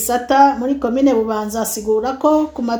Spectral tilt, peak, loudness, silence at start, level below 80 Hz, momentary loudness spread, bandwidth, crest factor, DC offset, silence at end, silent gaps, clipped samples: -4 dB/octave; 0 dBFS; -16 LUFS; 0 s; -46 dBFS; 8 LU; over 20 kHz; 16 dB; under 0.1%; 0 s; none; under 0.1%